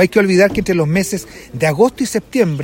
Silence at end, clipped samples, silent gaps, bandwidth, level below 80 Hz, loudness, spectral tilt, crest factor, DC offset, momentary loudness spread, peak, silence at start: 0 s; under 0.1%; none; 16.5 kHz; -42 dBFS; -15 LUFS; -5.5 dB/octave; 14 dB; under 0.1%; 9 LU; 0 dBFS; 0 s